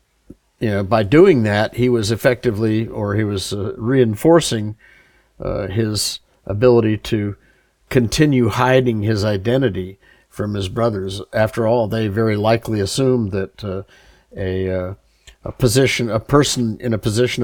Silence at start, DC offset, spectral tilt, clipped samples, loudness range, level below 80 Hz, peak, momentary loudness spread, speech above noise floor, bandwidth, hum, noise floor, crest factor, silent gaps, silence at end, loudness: 0.6 s; under 0.1%; -5.5 dB/octave; under 0.1%; 4 LU; -42 dBFS; -2 dBFS; 13 LU; 30 dB; 19.5 kHz; none; -46 dBFS; 16 dB; none; 0 s; -18 LUFS